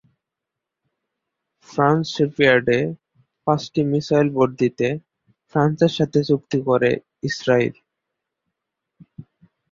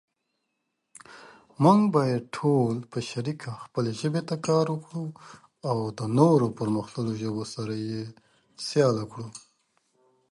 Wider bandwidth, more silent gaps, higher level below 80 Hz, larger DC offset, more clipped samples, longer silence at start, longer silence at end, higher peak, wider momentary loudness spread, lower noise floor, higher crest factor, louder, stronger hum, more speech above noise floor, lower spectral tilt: second, 7.6 kHz vs 11.5 kHz; neither; first, -58 dBFS vs -66 dBFS; neither; neither; first, 1.7 s vs 1.1 s; second, 0.5 s vs 0.95 s; first, -2 dBFS vs -6 dBFS; second, 9 LU vs 16 LU; first, -84 dBFS vs -79 dBFS; about the same, 20 dB vs 22 dB; first, -20 LUFS vs -26 LUFS; neither; first, 65 dB vs 53 dB; about the same, -6.5 dB/octave vs -7 dB/octave